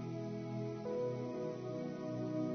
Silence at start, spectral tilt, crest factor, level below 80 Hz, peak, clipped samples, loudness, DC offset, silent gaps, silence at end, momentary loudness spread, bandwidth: 0 s; -8 dB/octave; 12 dB; -76 dBFS; -28 dBFS; under 0.1%; -42 LUFS; under 0.1%; none; 0 s; 3 LU; 6.4 kHz